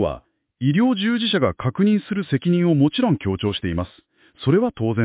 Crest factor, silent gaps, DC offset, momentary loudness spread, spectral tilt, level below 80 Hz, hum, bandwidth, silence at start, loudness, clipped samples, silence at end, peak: 14 dB; none; under 0.1%; 8 LU; -11.5 dB/octave; -44 dBFS; none; 4 kHz; 0 s; -20 LUFS; under 0.1%; 0 s; -6 dBFS